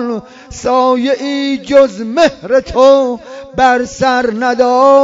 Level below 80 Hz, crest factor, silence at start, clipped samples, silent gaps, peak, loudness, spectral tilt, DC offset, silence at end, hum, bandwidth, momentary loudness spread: -42 dBFS; 12 dB; 0 s; 0.3%; none; 0 dBFS; -12 LUFS; -4.5 dB/octave; under 0.1%; 0 s; none; 7.8 kHz; 12 LU